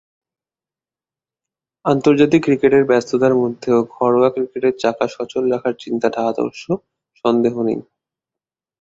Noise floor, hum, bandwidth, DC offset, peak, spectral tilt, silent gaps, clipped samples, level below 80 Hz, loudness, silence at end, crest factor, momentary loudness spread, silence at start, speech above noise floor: under -90 dBFS; none; 7.8 kHz; under 0.1%; 0 dBFS; -6.5 dB/octave; none; under 0.1%; -58 dBFS; -17 LUFS; 1 s; 18 dB; 9 LU; 1.85 s; over 74 dB